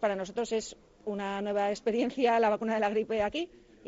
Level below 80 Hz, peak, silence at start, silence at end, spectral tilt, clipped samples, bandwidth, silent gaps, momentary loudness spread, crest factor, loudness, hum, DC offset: -62 dBFS; -14 dBFS; 0 s; 0.4 s; -3.5 dB/octave; under 0.1%; 8 kHz; none; 11 LU; 16 dB; -30 LUFS; none; under 0.1%